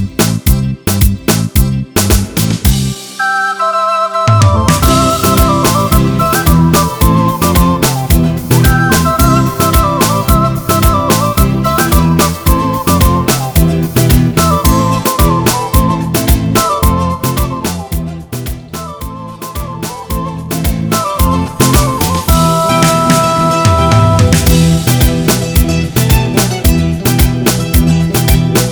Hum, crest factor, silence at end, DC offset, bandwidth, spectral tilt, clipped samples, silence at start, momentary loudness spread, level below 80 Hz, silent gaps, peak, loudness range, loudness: none; 10 dB; 0 s; under 0.1%; over 20 kHz; -5 dB/octave; under 0.1%; 0 s; 8 LU; -18 dBFS; none; 0 dBFS; 5 LU; -11 LUFS